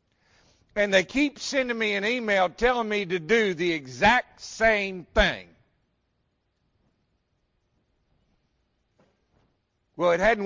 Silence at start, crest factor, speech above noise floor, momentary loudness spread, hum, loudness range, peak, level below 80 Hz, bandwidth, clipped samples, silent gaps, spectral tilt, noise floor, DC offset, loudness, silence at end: 0.75 s; 22 dB; 50 dB; 6 LU; none; 8 LU; -6 dBFS; -46 dBFS; 7.6 kHz; under 0.1%; none; -4 dB/octave; -74 dBFS; under 0.1%; -24 LUFS; 0 s